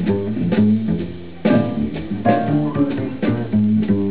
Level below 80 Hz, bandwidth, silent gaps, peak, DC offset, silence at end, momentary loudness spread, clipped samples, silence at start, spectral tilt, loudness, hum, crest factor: -42 dBFS; 4 kHz; none; -4 dBFS; 2%; 0 s; 6 LU; under 0.1%; 0 s; -12.5 dB/octave; -19 LUFS; none; 14 dB